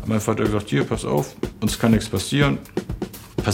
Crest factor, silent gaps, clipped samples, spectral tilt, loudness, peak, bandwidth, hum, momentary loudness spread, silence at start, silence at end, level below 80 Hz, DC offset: 20 dB; none; under 0.1%; -5.5 dB/octave; -22 LUFS; -2 dBFS; 17 kHz; none; 11 LU; 0 s; 0 s; -38 dBFS; under 0.1%